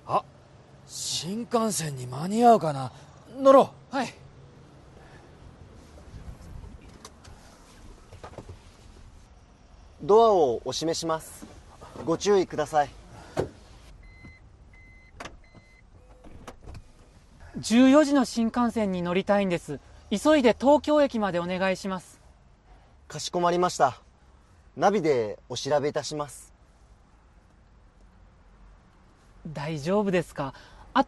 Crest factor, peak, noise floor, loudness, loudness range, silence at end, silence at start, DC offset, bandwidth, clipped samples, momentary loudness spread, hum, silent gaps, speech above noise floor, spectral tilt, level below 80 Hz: 22 dB; -6 dBFS; -56 dBFS; -25 LUFS; 16 LU; 0.05 s; 0.05 s; under 0.1%; 12.5 kHz; under 0.1%; 26 LU; none; none; 33 dB; -5 dB/octave; -54 dBFS